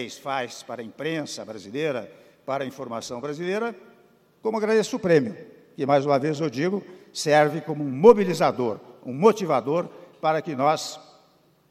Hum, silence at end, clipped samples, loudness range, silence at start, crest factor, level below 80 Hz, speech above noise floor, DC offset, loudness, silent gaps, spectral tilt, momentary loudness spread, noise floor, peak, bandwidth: none; 0.7 s; under 0.1%; 10 LU; 0 s; 24 dB; -66 dBFS; 37 dB; under 0.1%; -24 LUFS; none; -5.5 dB/octave; 16 LU; -60 dBFS; 0 dBFS; 14.5 kHz